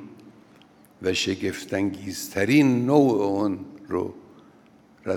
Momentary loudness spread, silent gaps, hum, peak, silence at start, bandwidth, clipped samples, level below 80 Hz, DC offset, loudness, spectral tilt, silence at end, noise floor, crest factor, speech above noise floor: 13 LU; none; none; -4 dBFS; 0 s; 18 kHz; under 0.1%; -68 dBFS; under 0.1%; -24 LUFS; -5.5 dB/octave; 0 s; -54 dBFS; 20 dB; 32 dB